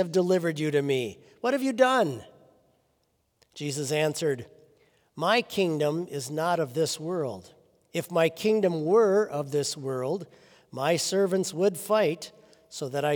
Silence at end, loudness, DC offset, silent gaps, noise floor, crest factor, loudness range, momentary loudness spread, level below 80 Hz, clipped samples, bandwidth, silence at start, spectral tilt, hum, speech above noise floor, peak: 0 s; -27 LUFS; under 0.1%; none; -72 dBFS; 20 dB; 3 LU; 13 LU; -76 dBFS; under 0.1%; over 20 kHz; 0 s; -4.5 dB/octave; none; 46 dB; -8 dBFS